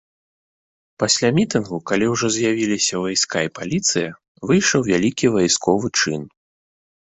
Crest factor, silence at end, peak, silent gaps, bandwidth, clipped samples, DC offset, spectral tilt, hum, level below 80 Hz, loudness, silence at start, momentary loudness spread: 18 dB; 0.75 s; -2 dBFS; 4.28-4.35 s; 8.4 kHz; under 0.1%; under 0.1%; -3.5 dB/octave; none; -54 dBFS; -19 LUFS; 1 s; 7 LU